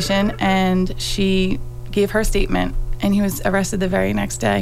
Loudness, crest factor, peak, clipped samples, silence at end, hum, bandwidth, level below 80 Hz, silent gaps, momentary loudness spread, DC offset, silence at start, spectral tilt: -20 LUFS; 14 dB; -4 dBFS; under 0.1%; 0 s; none; 15.5 kHz; -26 dBFS; none; 5 LU; under 0.1%; 0 s; -5 dB/octave